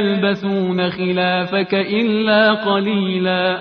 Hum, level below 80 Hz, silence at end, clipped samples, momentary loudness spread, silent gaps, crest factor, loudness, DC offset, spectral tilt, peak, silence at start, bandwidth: none; -58 dBFS; 0 s; under 0.1%; 5 LU; none; 16 dB; -17 LUFS; under 0.1%; -8 dB/octave; -2 dBFS; 0 s; 5.4 kHz